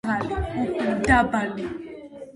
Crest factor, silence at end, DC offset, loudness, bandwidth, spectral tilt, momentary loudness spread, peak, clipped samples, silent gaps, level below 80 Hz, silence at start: 20 dB; 0.05 s; under 0.1%; -24 LUFS; 11.5 kHz; -6 dB/octave; 18 LU; -4 dBFS; under 0.1%; none; -38 dBFS; 0.05 s